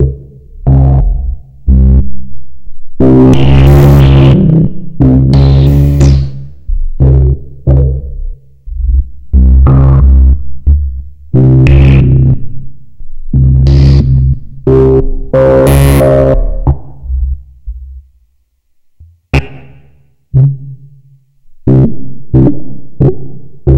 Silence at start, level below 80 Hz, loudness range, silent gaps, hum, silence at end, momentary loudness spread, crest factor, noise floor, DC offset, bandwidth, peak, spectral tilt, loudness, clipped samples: 0 s; -12 dBFS; 11 LU; none; none; 0 s; 18 LU; 8 dB; -54 dBFS; 4%; 15.5 kHz; 0 dBFS; -9 dB/octave; -8 LUFS; 3%